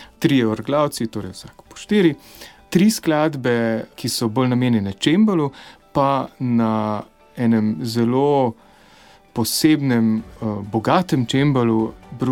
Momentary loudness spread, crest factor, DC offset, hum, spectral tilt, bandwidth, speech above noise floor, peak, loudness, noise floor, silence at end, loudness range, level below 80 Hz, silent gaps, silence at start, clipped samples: 11 LU; 18 dB; under 0.1%; none; -6 dB/octave; 17.5 kHz; 30 dB; -2 dBFS; -19 LUFS; -49 dBFS; 0 s; 1 LU; -52 dBFS; none; 0 s; under 0.1%